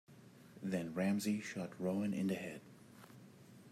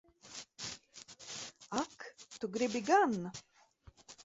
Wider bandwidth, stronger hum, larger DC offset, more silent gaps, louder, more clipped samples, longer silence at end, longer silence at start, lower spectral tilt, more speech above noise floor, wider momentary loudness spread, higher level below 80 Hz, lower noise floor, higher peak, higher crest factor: first, 15 kHz vs 8 kHz; neither; neither; neither; second, -40 LUFS vs -36 LUFS; neither; about the same, 0 s vs 0 s; second, 0.1 s vs 0.25 s; first, -6 dB/octave vs -3 dB/octave; second, 21 dB vs 30 dB; about the same, 23 LU vs 21 LU; second, -82 dBFS vs -72 dBFS; about the same, -60 dBFS vs -63 dBFS; second, -26 dBFS vs -18 dBFS; second, 14 dB vs 20 dB